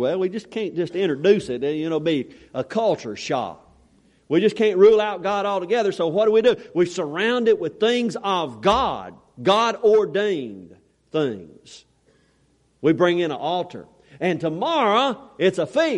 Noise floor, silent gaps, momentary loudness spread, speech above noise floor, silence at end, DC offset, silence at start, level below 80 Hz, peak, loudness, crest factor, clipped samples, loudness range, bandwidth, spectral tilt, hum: -62 dBFS; none; 10 LU; 41 dB; 0 s; under 0.1%; 0 s; -56 dBFS; -4 dBFS; -21 LUFS; 18 dB; under 0.1%; 6 LU; 10.5 kHz; -5.5 dB/octave; none